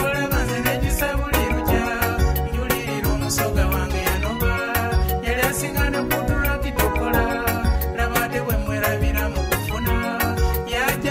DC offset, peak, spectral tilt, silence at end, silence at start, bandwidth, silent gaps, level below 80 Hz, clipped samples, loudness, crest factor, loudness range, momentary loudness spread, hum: under 0.1%; -4 dBFS; -5 dB/octave; 0 s; 0 s; 16.5 kHz; none; -26 dBFS; under 0.1%; -22 LUFS; 18 dB; 1 LU; 2 LU; none